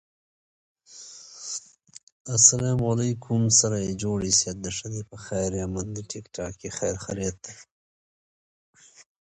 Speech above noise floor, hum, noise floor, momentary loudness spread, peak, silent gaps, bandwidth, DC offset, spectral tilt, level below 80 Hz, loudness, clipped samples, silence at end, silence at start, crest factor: 21 dB; none; -46 dBFS; 23 LU; -2 dBFS; 2.03-2.25 s, 7.72-8.73 s; 10.5 kHz; under 0.1%; -3.5 dB/octave; -50 dBFS; -24 LUFS; under 0.1%; 0.2 s; 0.9 s; 26 dB